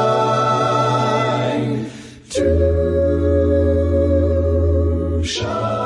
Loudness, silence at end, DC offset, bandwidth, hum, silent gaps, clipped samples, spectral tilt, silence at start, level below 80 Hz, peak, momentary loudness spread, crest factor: -17 LUFS; 0 s; under 0.1%; 11 kHz; none; none; under 0.1%; -6.5 dB/octave; 0 s; -30 dBFS; -4 dBFS; 5 LU; 12 dB